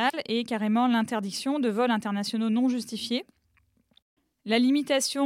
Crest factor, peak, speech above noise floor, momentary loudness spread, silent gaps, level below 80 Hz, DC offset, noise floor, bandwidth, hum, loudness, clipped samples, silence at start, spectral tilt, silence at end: 16 dB; -12 dBFS; 42 dB; 7 LU; 4.02-4.17 s; -76 dBFS; under 0.1%; -68 dBFS; 15.5 kHz; none; -26 LUFS; under 0.1%; 0 s; -4 dB/octave; 0 s